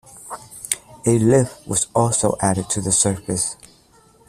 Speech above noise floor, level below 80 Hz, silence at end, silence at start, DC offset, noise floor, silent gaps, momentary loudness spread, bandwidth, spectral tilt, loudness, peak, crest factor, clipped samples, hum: 34 dB; -50 dBFS; 0.75 s; 0.15 s; under 0.1%; -53 dBFS; none; 18 LU; 14.5 kHz; -4.5 dB/octave; -19 LUFS; 0 dBFS; 20 dB; under 0.1%; none